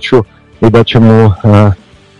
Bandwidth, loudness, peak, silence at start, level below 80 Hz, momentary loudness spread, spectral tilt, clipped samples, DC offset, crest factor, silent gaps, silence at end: 7.2 kHz; -7 LUFS; 0 dBFS; 0 s; -36 dBFS; 9 LU; -8.5 dB/octave; 8%; under 0.1%; 8 dB; none; 0.45 s